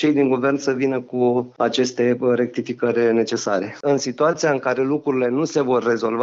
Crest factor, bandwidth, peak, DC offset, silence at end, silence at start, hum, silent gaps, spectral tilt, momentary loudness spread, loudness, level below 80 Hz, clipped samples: 14 dB; 7.8 kHz; -6 dBFS; under 0.1%; 0 s; 0 s; none; none; -5 dB/octave; 4 LU; -20 LUFS; -68 dBFS; under 0.1%